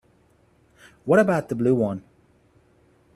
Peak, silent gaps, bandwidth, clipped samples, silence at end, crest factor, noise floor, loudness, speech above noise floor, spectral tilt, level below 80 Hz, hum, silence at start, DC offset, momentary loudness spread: -6 dBFS; none; 14.5 kHz; under 0.1%; 1.15 s; 20 dB; -60 dBFS; -21 LUFS; 40 dB; -8 dB/octave; -62 dBFS; none; 1.05 s; under 0.1%; 16 LU